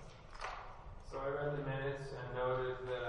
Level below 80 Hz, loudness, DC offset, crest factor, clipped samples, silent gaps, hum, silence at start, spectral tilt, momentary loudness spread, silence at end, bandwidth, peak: -56 dBFS; -41 LUFS; under 0.1%; 14 dB; under 0.1%; none; none; 0 s; -6.5 dB/octave; 14 LU; 0 s; 11 kHz; -26 dBFS